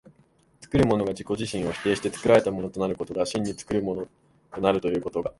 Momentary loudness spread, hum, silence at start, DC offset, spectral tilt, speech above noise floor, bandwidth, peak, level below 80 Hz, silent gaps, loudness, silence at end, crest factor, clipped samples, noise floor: 9 LU; none; 0.6 s; under 0.1%; -6 dB/octave; 36 dB; 11.5 kHz; -4 dBFS; -50 dBFS; none; -26 LUFS; 0.1 s; 22 dB; under 0.1%; -61 dBFS